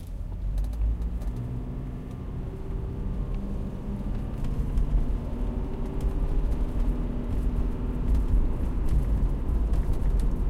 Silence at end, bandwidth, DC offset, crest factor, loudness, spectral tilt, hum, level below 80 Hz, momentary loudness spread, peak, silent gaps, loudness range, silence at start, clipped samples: 0 s; 4.5 kHz; under 0.1%; 14 dB; -31 LUFS; -9 dB/octave; none; -28 dBFS; 7 LU; -12 dBFS; none; 5 LU; 0 s; under 0.1%